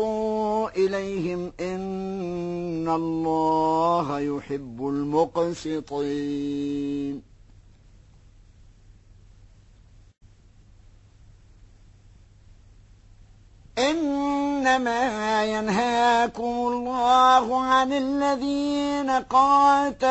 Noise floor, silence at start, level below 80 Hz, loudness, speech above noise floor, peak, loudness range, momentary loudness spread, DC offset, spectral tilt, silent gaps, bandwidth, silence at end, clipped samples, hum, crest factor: -53 dBFS; 0 s; -52 dBFS; -24 LUFS; 29 dB; -6 dBFS; 11 LU; 12 LU; under 0.1%; -5 dB/octave; none; 8.4 kHz; 0 s; under 0.1%; none; 18 dB